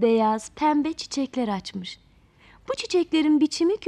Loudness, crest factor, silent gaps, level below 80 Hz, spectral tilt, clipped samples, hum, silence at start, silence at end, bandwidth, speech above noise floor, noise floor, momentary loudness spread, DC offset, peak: -24 LUFS; 14 dB; none; -60 dBFS; -4.5 dB/octave; under 0.1%; none; 0 s; 0 s; 11 kHz; 32 dB; -55 dBFS; 14 LU; under 0.1%; -10 dBFS